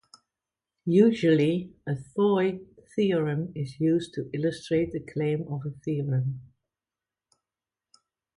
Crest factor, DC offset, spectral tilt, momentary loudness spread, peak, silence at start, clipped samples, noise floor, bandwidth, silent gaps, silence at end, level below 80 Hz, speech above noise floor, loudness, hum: 20 dB; under 0.1%; -8 dB/octave; 13 LU; -8 dBFS; 0.85 s; under 0.1%; under -90 dBFS; 11 kHz; none; 1.95 s; -62 dBFS; over 64 dB; -27 LUFS; none